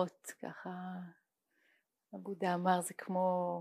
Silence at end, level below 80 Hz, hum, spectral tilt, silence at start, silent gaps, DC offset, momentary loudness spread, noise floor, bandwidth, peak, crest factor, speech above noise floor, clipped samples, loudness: 0 s; under -90 dBFS; none; -5.5 dB/octave; 0 s; none; under 0.1%; 16 LU; -77 dBFS; 15.5 kHz; -18 dBFS; 20 dB; 40 dB; under 0.1%; -37 LUFS